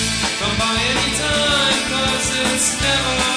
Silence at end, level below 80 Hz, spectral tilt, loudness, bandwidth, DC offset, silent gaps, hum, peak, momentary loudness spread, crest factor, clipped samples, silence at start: 0 s; -34 dBFS; -2 dB/octave; -16 LUFS; 11 kHz; under 0.1%; none; none; -6 dBFS; 3 LU; 12 dB; under 0.1%; 0 s